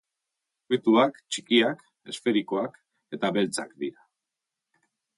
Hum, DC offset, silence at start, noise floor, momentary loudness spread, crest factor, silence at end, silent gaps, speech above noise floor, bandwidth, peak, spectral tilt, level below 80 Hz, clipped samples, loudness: none; under 0.1%; 0.7 s; -87 dBFS; 14 LU; 20 dB; 1.25 s; none; 61 dB; 11.5 kHz; -8 dBFS; -4 dB/octave; -76 dBFS; under 0.1%; -26 LUFS